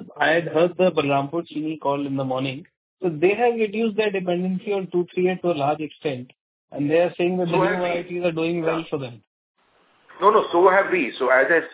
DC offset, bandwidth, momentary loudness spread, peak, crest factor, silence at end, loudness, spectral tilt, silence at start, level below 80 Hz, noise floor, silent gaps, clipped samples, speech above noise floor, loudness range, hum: under 0.1%; 4 kHz; 11 LU; -4 dBFS; 18 dB; 0 s; -22 LUFS; -10 dB/octave; 0 s; -68 dBFS; -61 dBFS; 2.77-2.97 s, 6.41-6.68 s, 9.27-9.55 s; under 0.1%; 39 dB; 2 LU; none